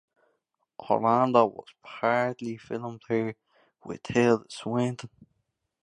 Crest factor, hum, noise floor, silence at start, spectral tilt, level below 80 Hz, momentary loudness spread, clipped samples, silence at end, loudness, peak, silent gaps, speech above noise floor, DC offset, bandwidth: 24 dB; none; -77 dBFS; 0.8 s; -6.5 dB/octave; -68 dBFS; 19 LU; under 0.1%; 0.8 s; -27 LUFS; -6 dBFS; none; 50 dB; under 0.1%; 10 kHz